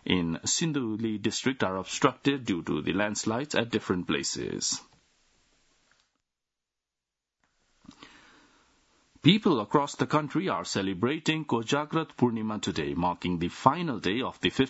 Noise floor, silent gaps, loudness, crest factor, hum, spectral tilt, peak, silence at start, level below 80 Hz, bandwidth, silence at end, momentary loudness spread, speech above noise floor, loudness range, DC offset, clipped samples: -89 dBFS; none; -28 LUFS; 26 dB; none; -4.5 dB/octave; -4 dBFS; 0.05 s; -62 dBFS; 8.2 kHz; 0 s; 5 LU; 61 dB; 7 LU; under 0.1%; under 0.1%